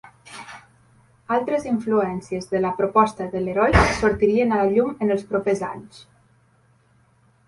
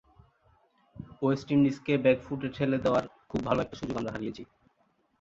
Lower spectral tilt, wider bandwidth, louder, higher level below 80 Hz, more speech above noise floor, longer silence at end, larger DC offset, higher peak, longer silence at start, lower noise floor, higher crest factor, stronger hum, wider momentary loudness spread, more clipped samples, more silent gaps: about the same, -6.5 dB/octave vs -7.5 dB/octave; first, 11.5 kHz vs 7.6 kHz; first, -21 LUFS vs -29 LUFS; first, -38 dBFS vs -58 dBFS; second, 39 dB vs 43 dB; first, 1.45 s vs 0.75 s; neither; first, -2 dBFS vs -12 dBFS; second, 0.25 s vs 0.95 s; second, -59 dBFS vs -71 dBFS; about the same, 20 dB vs 20 dB; neither; first, 19 LU vs 13 LU; neither; neither